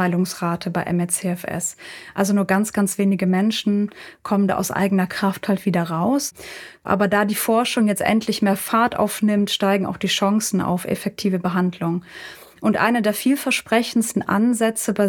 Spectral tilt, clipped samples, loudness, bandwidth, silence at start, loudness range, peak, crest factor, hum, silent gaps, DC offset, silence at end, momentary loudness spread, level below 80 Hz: -5 dB/octave; under 0.1%; -20 LUFS; 19.5 kHz; 0 s; 2 LU; -4 dBFS; 16 dB; none; none; under 0.1%; 0 s; 7 LU; -58 dBFS